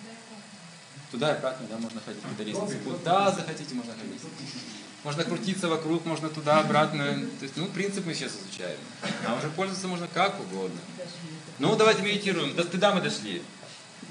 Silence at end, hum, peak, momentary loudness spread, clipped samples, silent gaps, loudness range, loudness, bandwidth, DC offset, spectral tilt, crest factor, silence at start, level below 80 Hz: 0 s; none; -8 dBFS; 17 LU; under 0.1%; none; 5 LU; -28 LUFS; 11 kHz; under 0.1%; -4.5 dB/octave; 22 dB; 0 s; -86 dBFS